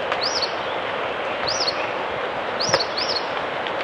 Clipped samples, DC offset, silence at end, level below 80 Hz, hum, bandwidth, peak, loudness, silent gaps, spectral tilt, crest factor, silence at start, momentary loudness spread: under 0.1%; under 0.1%; 0 s; -56 dBFS; none; 11 kHz; 0 dBFS; -23 LUFS; none; -2 dB/octave; 24 dB; 0 s; 5 LU